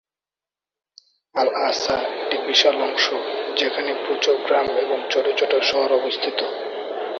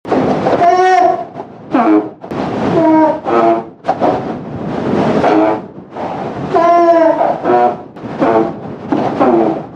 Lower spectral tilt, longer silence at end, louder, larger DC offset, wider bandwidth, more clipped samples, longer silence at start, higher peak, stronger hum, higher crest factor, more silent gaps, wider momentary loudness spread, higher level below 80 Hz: second, -1.5 dB/octave vs -7.5 dB/octave; about the same, 0 s vs 0 s; second, -21 LUFS vs -13 LUFS; neither; second, 7.4 kHz vs 8.2 kHz; neither; first, 1.35 s vs 0.05 s; about the same, -2 dBFS vs 0 dBFS; neither; first, 20 dB vs 12 dB; neither; second, 8 LU vs 13 LU; second, -62 dBFS vs -48 dBFS